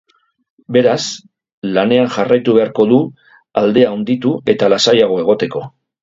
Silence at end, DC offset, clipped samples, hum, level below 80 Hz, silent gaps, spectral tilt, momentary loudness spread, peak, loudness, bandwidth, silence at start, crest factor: 0.35 s; under 0.1%; under 0.1%; none; -58 dBFS; 1.53-1.62 s; -5 dB/octave; 12 LU; 0 dBFS; -14 LUFS; 7.8 kHz; 0.7 s; 14 dB